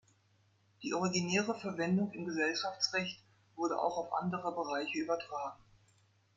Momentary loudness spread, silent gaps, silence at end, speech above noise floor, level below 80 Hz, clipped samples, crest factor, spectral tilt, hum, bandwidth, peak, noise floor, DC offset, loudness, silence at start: 8 LU; none; 0.8 s; 36 dB; -76 dBFS; under 0.1%; 18 dB; -4.5 dB/octave; none; 7.8 kHz; -18 dBFS; -71 dBFS; under 0.1%; -36 LUFS; 0.8 s